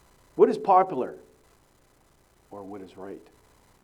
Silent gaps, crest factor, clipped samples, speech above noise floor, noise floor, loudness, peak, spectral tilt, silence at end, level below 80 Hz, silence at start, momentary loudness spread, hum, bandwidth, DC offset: none; 20 dB; under 0.1%; 37 dB; -62 dBFS; -23 LUFS; -8 dBFS; -7 dB/octave; 0.65 s; -66 dBFS; 0.35 s; 23 LU; none; 11.5 kHz; under 0.1%